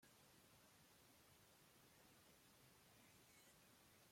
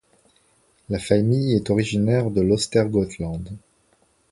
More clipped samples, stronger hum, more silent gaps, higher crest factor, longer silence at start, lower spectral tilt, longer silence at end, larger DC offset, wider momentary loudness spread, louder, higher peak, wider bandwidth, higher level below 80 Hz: neither; neither; neither; second, 14 dB vs 20 dB; second, 0 s vs 0.9 s; second, -2.5 dB/octave vs -6.5 dB/octave; second, 0 s vs 0.75 s; neither; second, 1 LU vs 11 LU; second, -70 LUFS vs -21 LUFS; second, -58 dBFS vs -2 dBFS; first, 16.5 kHz vs 11.5 kHz; second, -90 dBFS vs -46 dBFS